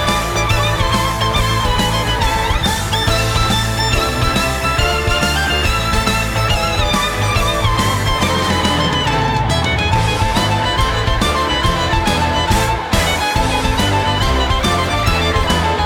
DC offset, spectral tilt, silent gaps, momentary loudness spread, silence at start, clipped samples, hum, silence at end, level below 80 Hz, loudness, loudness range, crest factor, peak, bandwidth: under 0.1%; -4 dB/octave; none; 1 LU; 0 s; under 0.1%; none; 0 s; -22 dBFS; -15 LUFS; 0 LU; 14 dB; -2 dBFS; over 20 kHz